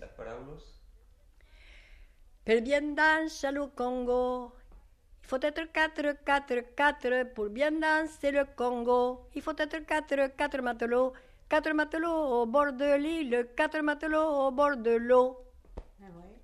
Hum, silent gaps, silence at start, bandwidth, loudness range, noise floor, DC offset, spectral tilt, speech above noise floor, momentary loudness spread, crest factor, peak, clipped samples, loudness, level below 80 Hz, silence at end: none; none; 0 s; 13 kHz; 3 LU; -59 dBFS; under 0.1%; -4 dB/octave; 30 dB; 9 LU; 18 dB; -14 dBFS; under 0.1%; -29 LUFS; -54 dBFS; 0.1 s